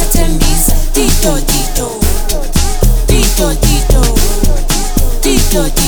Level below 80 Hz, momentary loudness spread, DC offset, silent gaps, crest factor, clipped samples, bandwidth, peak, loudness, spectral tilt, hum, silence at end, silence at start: -10 dBFS; 4 LU; under 0.1%; none; 8 dB; under 0.1%; over 20 kHz; 0 dBFS; -12 LUFS; -4 dB/octave; none; 0 s; 0 s